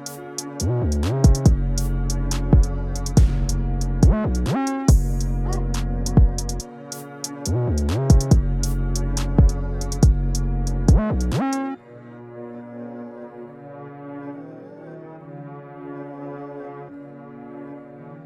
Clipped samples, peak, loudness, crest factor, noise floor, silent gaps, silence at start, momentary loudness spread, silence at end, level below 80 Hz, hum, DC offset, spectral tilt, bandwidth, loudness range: under 0.1%; -2 dBFS; -21 LUFS; 18 dB; -41 dBFS; none; 0 s; 20 LU; 0 s; -24 dBFS; none; under 0.1%; -6.5 dB/octave; 14.5 kHz; 16 LU